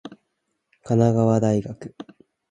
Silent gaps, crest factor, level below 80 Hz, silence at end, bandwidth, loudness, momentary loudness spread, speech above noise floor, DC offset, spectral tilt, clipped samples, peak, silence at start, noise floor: none; 18 dB; -56 dBFS; 0.45 s; 9.2 kHz; -20 LUFS; 21 LU; 55 dB; under 0.1%; -8.5 dB/octave; under 0.1%; -4 dBFS; 0.05 s; -76 dBFS